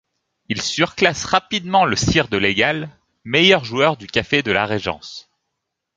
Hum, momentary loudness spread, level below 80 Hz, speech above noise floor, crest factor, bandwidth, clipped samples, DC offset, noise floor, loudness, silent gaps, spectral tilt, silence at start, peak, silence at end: none; 12 LU; -44 dBFS; 60 dB; 20 dB; 9.6 kHz; under 0.1%; under 0.1%; -78 dBFS; -18 LUFS; none; -4 dB/octave; 0.5 s; 0 dBFS; 0.75 s